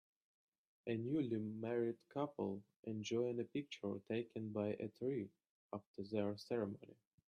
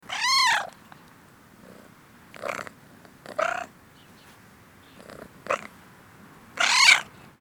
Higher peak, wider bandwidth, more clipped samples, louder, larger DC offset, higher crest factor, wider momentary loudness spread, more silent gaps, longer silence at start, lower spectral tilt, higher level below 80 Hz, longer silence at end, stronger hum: second, -26 dBFS vs 0 dBFS; second, 10.5 kHz vs over 20 kHz; neither; second, -44 LUFS vs -22 LUFS; neither; second, 18 dB vs 28 dB; second, 11 LU vs 27 LU; first, 2.76-2.83 s, 5.49-5.70 s, 5.87-5.94 s vs none; first, 0.85 s vs 0.1 s; first, -7 dB/octave vs 0.5 dB/octave; second, -84 dBFS vs -68 dBFS; about the same, 0.35 s vs 0.35 s; neither